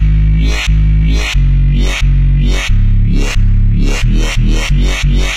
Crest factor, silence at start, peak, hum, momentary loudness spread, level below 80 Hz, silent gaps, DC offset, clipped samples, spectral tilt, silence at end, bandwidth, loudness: 8 dB; 0 s; -2 dBFS; none; 2 LU; -10 dBFS; none; 1%; under 0.1%; -5.5 dB/octave; 0 s; 9.6 kHz; -13 LUFS